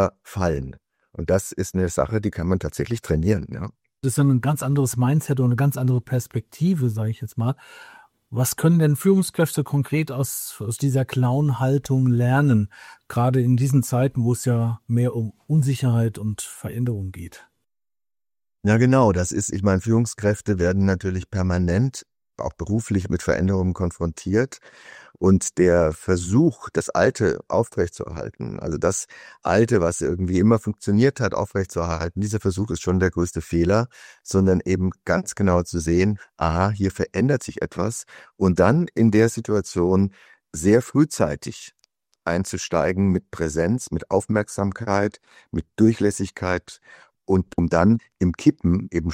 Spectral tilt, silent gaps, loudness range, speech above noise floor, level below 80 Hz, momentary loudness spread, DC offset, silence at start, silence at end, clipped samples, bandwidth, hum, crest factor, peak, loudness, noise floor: -6.5 dB/octave; none; 3 LU; over 69 dB; -46 dBFS; 10 LU; under 0.1%; 0 s; 0 s; under 0.1%; 16.5 kHz; none; 20 dB; -2 dBFS; -22 LUFS; under -90 dBFS